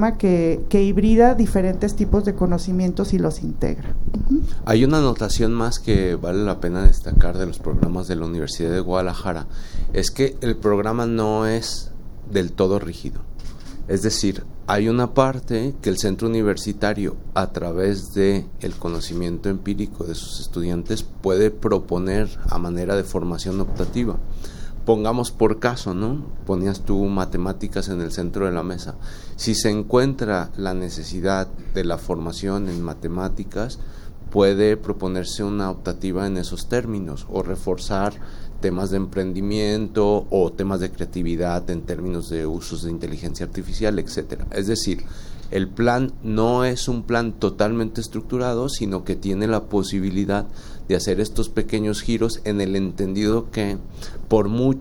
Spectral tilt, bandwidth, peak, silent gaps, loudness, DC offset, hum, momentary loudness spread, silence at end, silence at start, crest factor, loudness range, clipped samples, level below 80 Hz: -6 dB/octave; 17 kHz; 0 dBFS; none; -23 LUFS; under 0.1%; none; 10 LU; 0 s; 0 s; 20 dB; 5 LU; under 0.1%; -28 dBFS